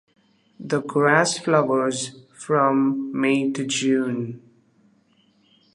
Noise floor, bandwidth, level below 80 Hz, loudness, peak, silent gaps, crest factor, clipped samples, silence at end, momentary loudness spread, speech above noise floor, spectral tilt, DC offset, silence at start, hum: -61 dBFS; 11 kHz; -74 dBFS; -21 LUFS; -2 dBFS; none; 20 dB; under 0.1%; 1.35 s; 14 LU; 40 dB; -4.5 dB/octave; under 0.1%; 0.6 s; none